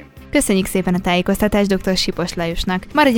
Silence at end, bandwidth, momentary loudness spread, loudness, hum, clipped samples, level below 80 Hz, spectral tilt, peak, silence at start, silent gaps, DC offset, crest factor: 0 s; 19 kHz; 6 LU; -18 LUFS; none; under 0.1%; -34 dBFS; -4.5 dB/octave; 0 dBFS; 0 s; none; under 0.1%; 16 dB